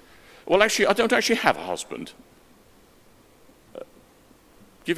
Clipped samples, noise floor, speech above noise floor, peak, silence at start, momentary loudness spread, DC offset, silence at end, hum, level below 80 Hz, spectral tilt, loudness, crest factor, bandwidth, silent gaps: under 0.1%; -55 dBFS; 33 dB; 0 dBFS; 0.45 s; 24 LU; under 0.1%; 0 s; none; -60 dBFS; -3 dB/octave; -22 LUFS; 26 dB; 16 kHz; none